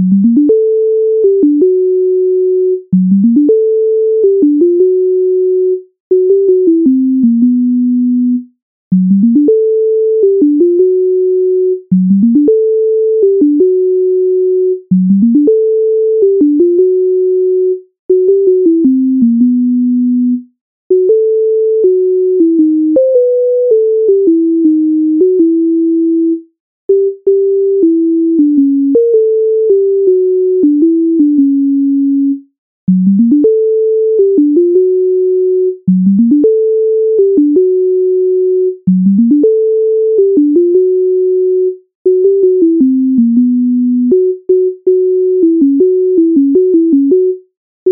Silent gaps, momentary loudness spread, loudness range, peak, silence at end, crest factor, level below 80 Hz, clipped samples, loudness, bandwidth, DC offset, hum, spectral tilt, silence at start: 6.00-6.10 s, 8.62-8.91 s, 17.99-18.09 s, 20.61-20.90 s, 26.60-26.89 s, 32.58-32.87 s, 41.95-42.05 s, 47.57-47.86 s; 3 LU; 1 LU; 0 dBFS; 0 s; 8 dB; -60 dBFS; under 0.1%; -10 LUFS; 0.8 kHz; under 0.1%; none; -18.5 dB/octave; 0 s